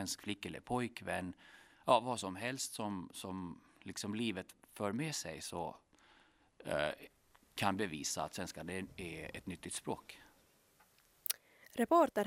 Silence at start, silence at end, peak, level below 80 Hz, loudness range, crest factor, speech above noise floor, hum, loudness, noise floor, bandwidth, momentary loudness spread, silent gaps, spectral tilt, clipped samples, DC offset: 0 s; 0 s; -14 dBFS; -72 dBFS; 5 LU; 26 dB; 31 dB; none; -40 LUFS; -70 dBFS; 16 kHz; 16 LU; none; -4 dB/octave; under 0.1%; under 0.1%